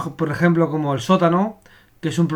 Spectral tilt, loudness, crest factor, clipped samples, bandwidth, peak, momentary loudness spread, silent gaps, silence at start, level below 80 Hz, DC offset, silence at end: -7 dB/octave; -19 LUFS; 18 dB; under 0.1%; 12.5 kHz; -2 dBFS; 9 LU; none; 0 s; -56 dBFS; under 0.1%; 0 s